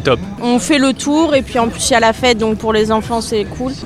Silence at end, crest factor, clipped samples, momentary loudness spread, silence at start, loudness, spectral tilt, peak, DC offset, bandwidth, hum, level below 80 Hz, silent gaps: 0 s; 14 dB; under 0.1%; 6 LU; 0 s; -14 LUFS; -4 dB/octave; 0 dBFS; under 0.1%; 14.5 kHz; none; -36 dBFS; none